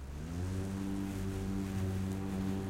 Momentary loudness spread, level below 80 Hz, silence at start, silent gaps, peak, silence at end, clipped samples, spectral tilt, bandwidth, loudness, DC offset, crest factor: 2 LU; -48 dBFS; 0 s; none; -26 dBFS; 0 s; under 0.1%; -7 dB/octave; 16.5 kHz; -38 LUFS; under 0.1%; 12 dB